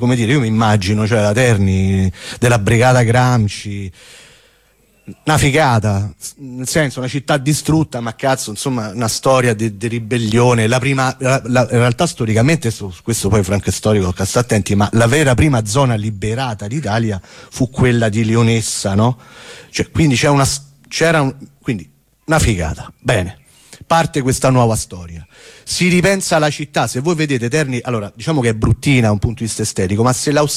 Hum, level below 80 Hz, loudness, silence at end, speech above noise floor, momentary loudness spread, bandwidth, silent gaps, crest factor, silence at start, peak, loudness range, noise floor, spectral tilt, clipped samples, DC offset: none; -36 dBFS; -15 LUFS; 0 s; 39 dB; 11 LU; 15.5 kHz; none; 12 dB; 0 s; -2 dBFS; 3 LU; -54 dBFS; -5.5 dB/octave; under 0.1%; under 0.1%